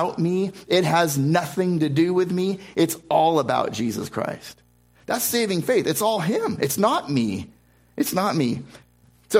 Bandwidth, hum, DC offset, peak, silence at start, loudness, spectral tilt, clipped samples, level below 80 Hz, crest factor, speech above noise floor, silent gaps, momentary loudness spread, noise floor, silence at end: 16 kHz; 60 Hz at -55 dBFS; under 0.1%; -4 dBFS; 0 s; -22 LUFS; -5 dB/octave; under 0.1%; -60 dBFS; 18 dB; 20 dB; none; 9 LU; -42 dBFS; 0 s